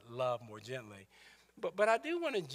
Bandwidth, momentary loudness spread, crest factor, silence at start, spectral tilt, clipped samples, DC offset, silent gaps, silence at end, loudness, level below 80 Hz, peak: 15 kHz; 16 LU; 22 dB; 0.05 s; -5 dB/octave; under 0.1%; under 0.1%; none; 0 s; -36 LUFS; -80 dBFS; -16 dBFS